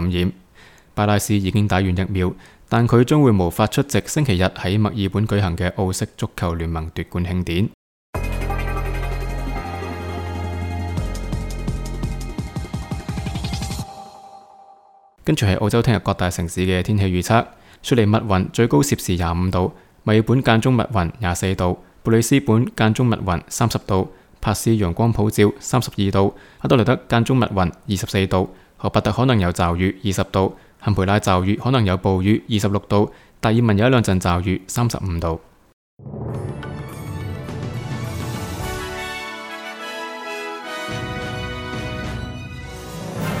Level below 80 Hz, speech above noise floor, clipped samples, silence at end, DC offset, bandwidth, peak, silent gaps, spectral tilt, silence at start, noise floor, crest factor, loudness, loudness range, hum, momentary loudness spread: -36 dBFS; 32 dB; under 0.1%; 0 s; under 0.1%; 17.5 kHz; 0 dBFS; 7.74-8.13 s, 35.73-35.97 s; -6 dB/octave; 0 s; -51 dBFS; 20 dB; -21 LUFS; 10 LU; none; 12 LU